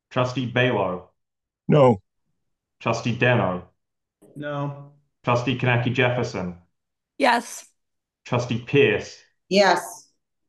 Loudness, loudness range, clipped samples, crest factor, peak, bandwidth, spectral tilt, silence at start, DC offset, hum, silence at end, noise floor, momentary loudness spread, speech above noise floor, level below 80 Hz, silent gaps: -22 LUFS; 3 LU; under 0.1%; 20 dB; -4 dBFS; 12.5 kHz; -6 dB/octave; 0.1 s; under 0.1%; none; 0.5 s; -82 dBFS; 17 LU; 61 dB; -62 dBFS; none